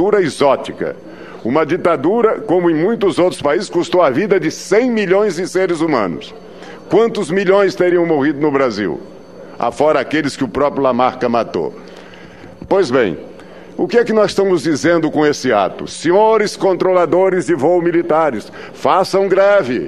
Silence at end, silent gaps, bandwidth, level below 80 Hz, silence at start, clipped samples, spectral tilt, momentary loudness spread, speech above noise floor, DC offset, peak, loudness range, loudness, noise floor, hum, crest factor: 0 s; none; 12.5 kHz; -52 dBFS; 0 s; under 0.1%; -5.5 dB/octave; 11 LU; 22 dB; 0.5%; 0 dBFS; 3 LU; -15 LUFS; -36 dBFS; none; 14 dB